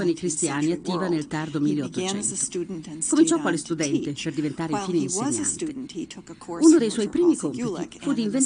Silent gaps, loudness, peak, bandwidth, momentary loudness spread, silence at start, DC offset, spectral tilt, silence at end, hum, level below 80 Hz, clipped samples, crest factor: none; -24 LUFS; -4 dBFS; 10.5 kHz; 12 LU; 0 s; under 0.1%; -4.5 dB/octave; 0 s; none; -60 dBFS; under 0.1%; 18 dB